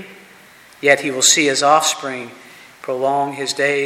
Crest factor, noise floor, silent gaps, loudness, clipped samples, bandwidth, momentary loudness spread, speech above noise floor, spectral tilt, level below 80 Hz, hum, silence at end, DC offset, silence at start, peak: 18 dB; -45 dBFS; none; -15 LUFS; under 0.1%; 16.5 kHz; 16 LU; 28 dB; -1 dB/octave; -68 dBFS; none; 0 s; under 0.1%; 0 s; 0 dBFS